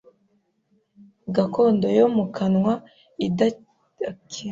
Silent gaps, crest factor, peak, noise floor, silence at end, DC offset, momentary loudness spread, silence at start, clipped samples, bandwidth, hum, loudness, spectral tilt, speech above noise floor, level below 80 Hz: none; 18 dB; -6 dBFS; -67 dBFS; 0 s; under 0.1%; 15 LU; 1.25 s; under 0.1%; 7.6 kHz; none; -22 LUFS; -7 dB/octave; 46 dB; -62 dBFS